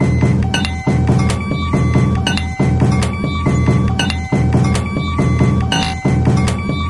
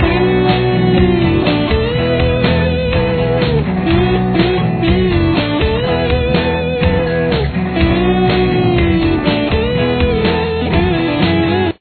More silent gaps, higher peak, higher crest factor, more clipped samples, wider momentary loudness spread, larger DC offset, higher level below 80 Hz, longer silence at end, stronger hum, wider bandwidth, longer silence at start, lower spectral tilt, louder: neither; about the same, -2 dBFS vs 0 dBFS; about the same, 14 dB vs 12 dB; neither; about the same, 4 LU vs 2 LU; neither; about the same, -28 dBFS vs -24 dBFS; about the same, 0 s vs 0.05 s; neither; first, 11.5 kHz vs 4.6 kHz; about the same, 0 s vs 0 s; second, -6 dB/octave vs -10 dB/octave; about the same, -15 LUFS vs -14 LUFS